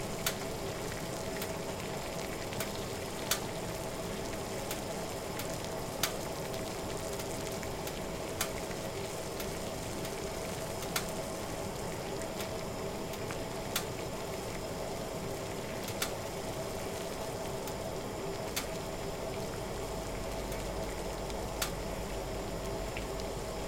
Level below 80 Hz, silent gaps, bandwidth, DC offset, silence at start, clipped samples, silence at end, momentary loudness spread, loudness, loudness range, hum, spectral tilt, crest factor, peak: -50 dBFS; none; 17 kHz; under 0.1%; 0 s; under 0.1%; 0 s; 3 LU; -38 LUFS; 1 LU; none; -4 dB/octave; 26 dB; -12 dBFS